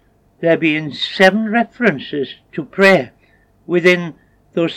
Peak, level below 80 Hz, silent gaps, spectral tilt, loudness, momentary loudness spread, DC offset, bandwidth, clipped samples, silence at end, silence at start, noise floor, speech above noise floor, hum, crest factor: 0 dBFS; -60 dBFS; none; -6 dB/octave; -15 LUFS; 14 LU; under 0.1%; 16.5 kHz; under 0.1%; 0 s; 0.4 s; -53 dBFS; 38 dB; none; 16 dB